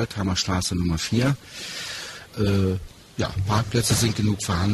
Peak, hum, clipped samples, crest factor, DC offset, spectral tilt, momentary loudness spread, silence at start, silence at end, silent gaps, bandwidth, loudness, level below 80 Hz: -8 dBFS; none; under 0.1%; 16 dB; under 0.1%; -4.5 dB/octave; 11 LU; 0 s; 0 s; none; 13.5 kHz; -24 LUFS; -42 dBFS